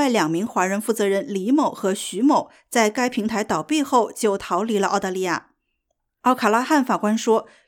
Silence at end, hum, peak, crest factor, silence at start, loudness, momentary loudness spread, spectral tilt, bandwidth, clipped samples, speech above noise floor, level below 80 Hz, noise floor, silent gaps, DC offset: 0.25 s; none; -4 dBFS; 16 dB; 0 s; -21 LUFS; 5 LU; -4.5 dB/octave; 18 kHz; under 0.1%; 55 dB; -62 dBFS; -75 dBFS; none; under 0.1%